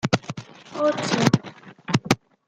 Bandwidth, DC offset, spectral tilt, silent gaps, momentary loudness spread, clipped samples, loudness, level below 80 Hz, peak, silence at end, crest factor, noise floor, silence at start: 16 kHz; under 0.1%; -5 dB/octave; none; 18 LU; under 0.1%; -23 LUFS; -56 dBFS; 0 dBFS; 0.35 s; 24 dB; -43 dBFS; 0.05 s